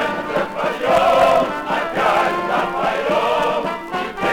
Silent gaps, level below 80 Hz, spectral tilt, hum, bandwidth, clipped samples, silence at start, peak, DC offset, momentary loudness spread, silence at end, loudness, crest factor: none; -48 dBFS; -4.5 dB/octave; none; 19.5 kHz; under 0.1%; 0 s; -4 dBFS; under 0.1%; 8 LU; 0 s; -18 LUFS; 14 dB